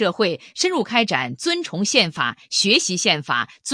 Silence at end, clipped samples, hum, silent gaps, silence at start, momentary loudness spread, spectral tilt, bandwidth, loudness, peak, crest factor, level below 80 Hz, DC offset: 0 s; under 0.1%; none; none; 0 s; 6 LU; -2.5 dB/octave; 10.5 kHz; -19 LUFS; -2 dBFS; 20 dB; -68 dBFS; under 0.1%